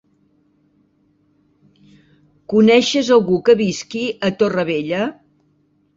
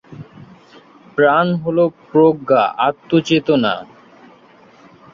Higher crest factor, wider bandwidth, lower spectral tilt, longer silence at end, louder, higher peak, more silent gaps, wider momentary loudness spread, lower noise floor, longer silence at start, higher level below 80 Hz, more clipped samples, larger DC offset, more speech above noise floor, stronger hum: about the same, 18 dB vs 16 dB; about the same, 7.8 kHz vs 7.2 kHz; second, -5 dB/octave vs -6.5 dB/octave; second, 0.85 s vs 1.3 s; about the same, -16 LUFS vs -16 LUFS; about the same, -2 dBFS vs -2 dBFS; neither; first, 10 LU vs 7 LU; first, -60 dBFS vs -47 dBFS; first, 2.5 s vs 0.1 s; about the same, -58 dBFS vs -58 dBFS; neither; neither; first, 45 dB vs 32 dB; neither